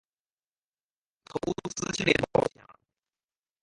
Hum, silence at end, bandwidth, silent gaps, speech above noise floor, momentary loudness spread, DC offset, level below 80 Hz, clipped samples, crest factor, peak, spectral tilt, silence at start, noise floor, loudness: none; 0.9 s; 11.5 kHz; none; over 62 dB; 10 LU; under 0.1%; -58 dBFS; under 0.1%; 26 dB; -6 dBFS; -4 dB/octave; 1.35 s; under -90 dBFS; -29 LUFS